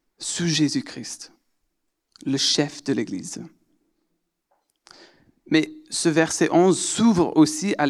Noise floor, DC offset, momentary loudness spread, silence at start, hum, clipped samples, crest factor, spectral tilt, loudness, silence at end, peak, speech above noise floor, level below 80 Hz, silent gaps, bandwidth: -75 dBFS; under 0.1%; 16 LU; 0.2 s; none; under 0.1%; 20 dB; -4 dB/octave; -21 LUFS; 0 s; -4 dBFS; 53 dB; -64 dBFS; none; 12.5 kHz